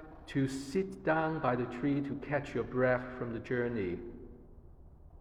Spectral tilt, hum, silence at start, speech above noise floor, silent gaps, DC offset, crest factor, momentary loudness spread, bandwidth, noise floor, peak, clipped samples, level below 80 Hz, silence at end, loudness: -7 dB/octave; none; 0 s; 21 dB; none; under 0.1%; 18 dB; 9 LU; 13.5 kHz; -54 dBFS; -16 dBFS; under 0.1%; -56 dBFS; 0 s; -34 LUFS